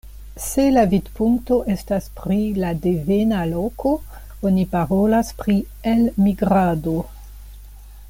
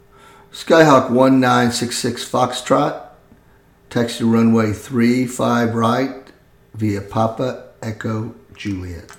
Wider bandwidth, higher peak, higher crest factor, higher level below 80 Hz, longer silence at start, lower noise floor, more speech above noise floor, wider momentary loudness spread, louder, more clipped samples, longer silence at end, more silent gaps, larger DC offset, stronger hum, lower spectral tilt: about the same, 17 kHz vs 16.5 kHz; second, -4 dBFS vs 0 dBFS; about the same, 16 dB vs 18 dB; first, -36 dBFS vs -52 dBFS; second, 0.05 s vs 0.55 s; second, -39 dBFS vs -51 dBFS; second, 20 dB vs 34 dB; second, 8 LU vs 16 LU; second, -20 LUFS vs -17 LUFS; neither; about the same, 0 s vs 0.05 s; neither; neither; neither; first, -7 dB/octave vs -5.5 dB/octave